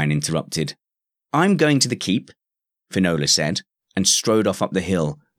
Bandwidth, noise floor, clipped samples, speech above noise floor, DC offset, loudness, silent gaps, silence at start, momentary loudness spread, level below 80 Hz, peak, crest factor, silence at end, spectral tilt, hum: 16.5 kHz; -87 dBFS; under 0.1%; 67 dB; under 0.1%; -20 LUFS; none; 0 s; 10 LU; -54 dBFS; -4 dBFS; 18 dB; 0.25 s; -4 dB/octave; none